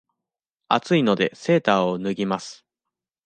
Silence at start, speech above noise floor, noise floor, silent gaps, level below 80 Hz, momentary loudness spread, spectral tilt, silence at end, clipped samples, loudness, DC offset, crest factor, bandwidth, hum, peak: 0.7 s; 65 dB; -87 dBFS; none; -64 dBFS; 8 LU; -6 dB/octave; 0.7 s; under 0.1%; -22 LUFS; under 0.1%; 22 dB; 9.4 kHz; none; -2 dBFS